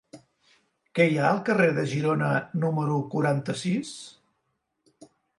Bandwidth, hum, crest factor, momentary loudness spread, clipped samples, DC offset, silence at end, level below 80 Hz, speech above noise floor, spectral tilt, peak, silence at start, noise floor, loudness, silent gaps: 11.5 kHz; none; 18 dB; 11 LU; under 0.1%; under 0.1%; 1.3 s; -70 dBFS; 52 dB; -6.5 dB/octave; -8 dBFS; 0.15 s; -77 dBFS; -25 LUFS; none